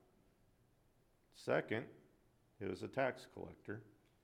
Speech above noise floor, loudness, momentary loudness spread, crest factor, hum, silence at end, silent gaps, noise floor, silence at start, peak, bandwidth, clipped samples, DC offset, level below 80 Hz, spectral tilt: 31 dB; -44 LUFS; 14 LU; 22 dB; none; 0.3 s; none; -74 dBFS; 1.35 s; -24 dBFS; 16 kHz; under 0.1%; under 0.1%; -78 dBFS; -6 dB/octave